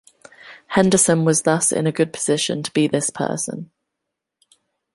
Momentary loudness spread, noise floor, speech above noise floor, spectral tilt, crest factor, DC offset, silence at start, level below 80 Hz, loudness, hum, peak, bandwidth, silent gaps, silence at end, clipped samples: 9 LU; -81 dBFS; 62 dB; -4 dB/octave; 20 dB; under 0.1%; 0.45 s; -60 dBFS; -19 LUFS; none; -2 dBFS; 12 kHz; none; 1.3 s; under 0.1%